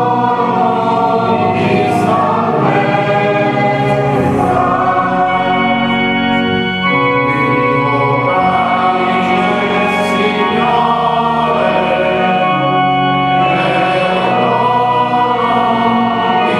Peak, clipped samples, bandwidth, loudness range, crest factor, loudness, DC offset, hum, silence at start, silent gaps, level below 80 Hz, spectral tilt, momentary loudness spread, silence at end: 0 dBFS; under 0.1%; 12 kHz; 0 LU; 12 dB; -12 LUFS; under 0.1%; none; 0 s; none; -44 dBFS; -6.5 dB/octave; 1 LU; 0 s